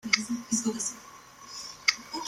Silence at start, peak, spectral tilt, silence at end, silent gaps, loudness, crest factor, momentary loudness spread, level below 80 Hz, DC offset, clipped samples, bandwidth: 0.05 s; -6 dBFS; -1 dB/octave; 0 s; none; -29 LUFS; 26 dB; 19 LU; -68 dBFS; under 0.1%; under 0.1%; 16.5 kHz